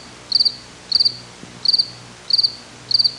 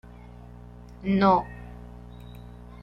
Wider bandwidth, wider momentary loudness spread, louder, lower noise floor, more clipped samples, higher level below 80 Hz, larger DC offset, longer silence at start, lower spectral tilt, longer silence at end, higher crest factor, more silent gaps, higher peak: first, 11.5 kHz vs 6 kHz; second, 20 LU vs 26 LU; first, -17 LUFS vs -23 LUFS; second, -38 dBFS vs -45 dBFS; neither; second, -58 dBFS vs -46 dBFS; neither; second, 0 s vs 1 s; second, -1 dB/octave vs -8.5 dB/octave; second, 0 s vs 0.35 s; second, 16 dB vs 22 dB; neither; about the same, -4 dBFS vs -6 dBFS